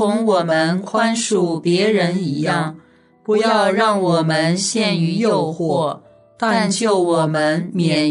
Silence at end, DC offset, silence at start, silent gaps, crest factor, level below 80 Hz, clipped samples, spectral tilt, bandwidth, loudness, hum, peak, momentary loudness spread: 0 s; under 0.1%; 0 s; none; 14 dB; -64 dBFS; under 0.1%; -5 dB/octave; 11 kHz; -17 LUFS; none; -2 dBFS; 5 LU